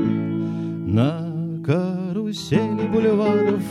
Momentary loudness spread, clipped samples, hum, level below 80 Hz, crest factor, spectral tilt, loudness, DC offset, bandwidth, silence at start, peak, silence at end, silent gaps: 8 LU; under 0.1%; none; -54 dBFS; 16 dB; -8 dB/octave; -22 LUFS; under 0.1%; 12.5 kHz; 0 s; -4 dBFS; 0 s; none